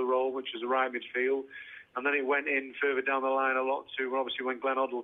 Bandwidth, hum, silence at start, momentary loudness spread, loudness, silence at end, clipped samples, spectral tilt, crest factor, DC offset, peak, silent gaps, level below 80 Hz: 3.9 kHz; none; 0 s; 6 LU; -30 LUFS; 0 s; under 0.1%; -5.5 dB/octave; 16 dB; under 0.1%; -16 dBFS; none; -80 dBFS